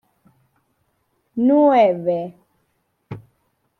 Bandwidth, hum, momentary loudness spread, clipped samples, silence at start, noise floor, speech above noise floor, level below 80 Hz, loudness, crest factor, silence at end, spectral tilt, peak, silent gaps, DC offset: 6.2 kHz; none; 24 LU; under 0.1%; 1.35 s; -69 dBFS; 53 dB; -66 dBFS; -17 LUFS; 18 dB; 0.6 s; -8.5 dB/octave; -4 dBFS; none; under 0.1%